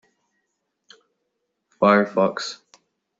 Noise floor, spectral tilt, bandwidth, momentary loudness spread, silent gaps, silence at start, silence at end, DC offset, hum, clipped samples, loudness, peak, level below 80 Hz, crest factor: -76 dBFS; -4 dB/octave; 7.8 kHz; 15 LU; none; 1.8 s; 0.65 s; under 0.1%; none; under 0.1%; -20 LUFS; -4 dBFS; -70 dBFS; 22 dB